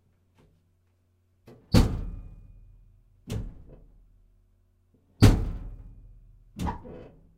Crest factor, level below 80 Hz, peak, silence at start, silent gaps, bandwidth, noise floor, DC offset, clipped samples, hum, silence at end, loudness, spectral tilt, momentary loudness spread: 26 dB; -34 dBFS; -4 dBFS; 1.7 s; none; 16 kHz; -68 dBFS; under 0.1%; under 0.1%; none; 0.35 s; -26 LUFS; -6.5 dB/octave; 26 LU